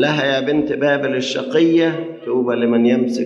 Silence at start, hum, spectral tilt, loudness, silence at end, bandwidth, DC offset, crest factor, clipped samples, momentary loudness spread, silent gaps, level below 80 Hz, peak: 0 s; none; -5.5 dB/octave; -17 LUFS; 0 s; 7.8 kHz; under 0.1%; 14 dB; under 0.1%; 6 LU; none; -60 dBFS; -2 dBFS